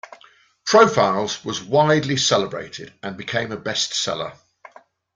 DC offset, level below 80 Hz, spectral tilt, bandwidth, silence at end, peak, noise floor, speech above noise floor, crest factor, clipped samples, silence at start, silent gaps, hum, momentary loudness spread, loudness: under 0.1%; -60 dBFS; -3.5 dB/octave; 9.6 kHz; 0.8 s; -2 dBFS; -53 dBFS; 33 dB; 20 dB; under 0.1%; 0.65 s; none; none; 17 LU; -19 LUFS